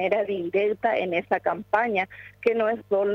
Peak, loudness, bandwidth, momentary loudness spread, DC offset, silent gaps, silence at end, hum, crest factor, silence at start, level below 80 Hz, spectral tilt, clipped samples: -10 dBFS; -25 LUFS; 6.4 kHz; 3 LU; under 0.1%; none; 0 s; none; 14 dB; 0 s; -66 dBFS; -7 dB/octave; under 0.1%